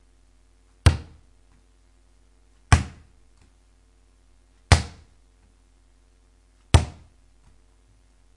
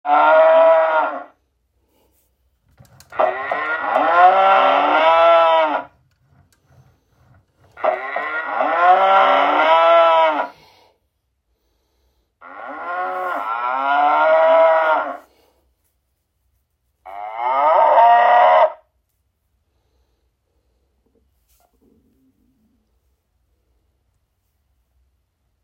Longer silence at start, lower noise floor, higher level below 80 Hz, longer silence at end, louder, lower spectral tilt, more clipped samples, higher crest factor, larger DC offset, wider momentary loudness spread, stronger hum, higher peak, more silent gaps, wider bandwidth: first, 0.85 s vs 0.05 s; second, -58 dBFS vs -70 dBFS; first, -34 dBFS vs -66 dBFS; second, 1.45 s vs 6.9 s; second, -23 LUFS vs -15 LUFS; about the same, -5 dB/octave vs -4 dB/octave; neither; first, 28 dB vs 18 dB; neither; about the same, 16 LU vs 15 LU; neither; about the same, 0 dBFS vs 0 dBFS; neither; first, 11.5 kHz vs 6.4 kHz